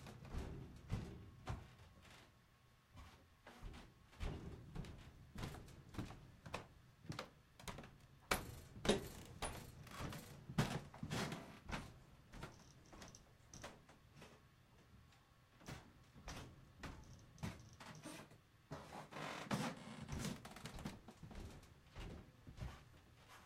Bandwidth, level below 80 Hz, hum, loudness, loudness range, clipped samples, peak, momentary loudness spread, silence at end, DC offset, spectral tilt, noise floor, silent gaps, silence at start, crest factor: 16 kHz; -60 dBFS; none; -50 LUFS; 13 LU; under 0.1%; -18 dBFS; 20 LU; 0 s; under 0.1%; -4.5 dB/octave; -71 dBFS; none; 0 s; 32 dB